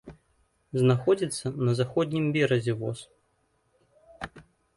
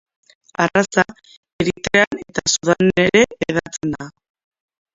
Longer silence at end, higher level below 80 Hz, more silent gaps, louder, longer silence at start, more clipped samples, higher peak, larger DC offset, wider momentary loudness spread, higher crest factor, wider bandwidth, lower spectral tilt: second, 0.35 s vs 0.85 s; second, -60 dBFS vs -48 dBFS; second, none vs 1.37-1.43 s, 1.53-1.59 s, 2.07-2.11 s; second, -26 LUFS vs -18 LUFS; second, 0.05 s vs 0.6 s; neither; second, -10 dBFS vs 0 dBFS; neither; first, 18 LU vs 11 LU; about the same, 18 dB vs 20 dB; first, 11.5 kHz vs 7.8 kHz; first, -6.5 dB/octave vs -4 dB/octave